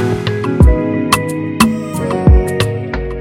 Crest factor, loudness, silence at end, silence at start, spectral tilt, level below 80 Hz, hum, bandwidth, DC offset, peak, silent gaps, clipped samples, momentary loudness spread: 12 dB; -14 LUFS; 0 s; 0 s; -6 dB/octave; -18 dBFS; none; 16.5 kHz; under 0.1%; 0 dBFS; none; under 0.1%; 8 LU